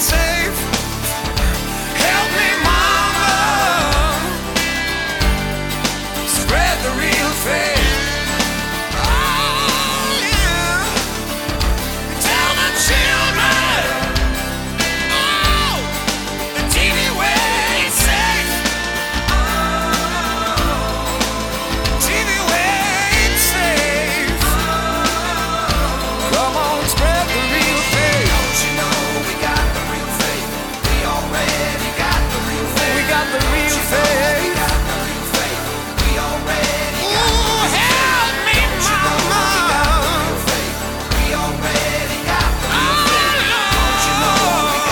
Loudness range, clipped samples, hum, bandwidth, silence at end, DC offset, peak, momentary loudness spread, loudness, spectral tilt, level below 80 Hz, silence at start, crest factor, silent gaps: 3 LU; under 0.1%; none; 19 kHz; 0 s; under 0.1%; -2 dBFS; 6 LU; -16 LUFS; -3 dB/octave; -24 dBFS; 0 s; 16 dB; none